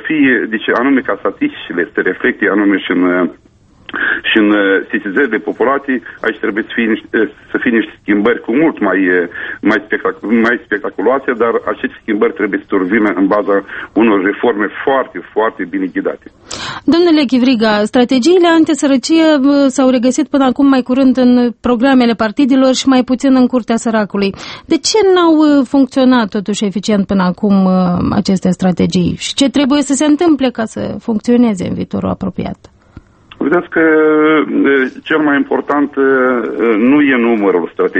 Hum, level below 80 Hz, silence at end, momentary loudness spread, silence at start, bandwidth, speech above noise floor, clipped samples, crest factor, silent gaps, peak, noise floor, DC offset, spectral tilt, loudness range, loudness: none; -46 dBFS; 0 s; 8 LU; 0 s; 8.8 kHz; 28 dB; under 0.1%; 12 dB; none; 0 dBFS; -40 dBFS; under 0.1%; -5 dB/octave; 4 LU; -12 LUFS